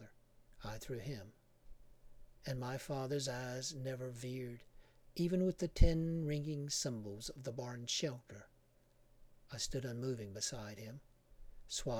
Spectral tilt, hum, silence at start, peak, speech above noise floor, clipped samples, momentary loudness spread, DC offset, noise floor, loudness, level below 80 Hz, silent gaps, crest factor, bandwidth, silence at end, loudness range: -4.5 dB/octave; none; 0 s; -14 dBFS; 30 dB; under 0.1%; 16 LU; under 0.1%; -69 dBFS; -41 LUFS; -46 dBFS; none; 26 dB; 17 kHz; 0 s; 7 LU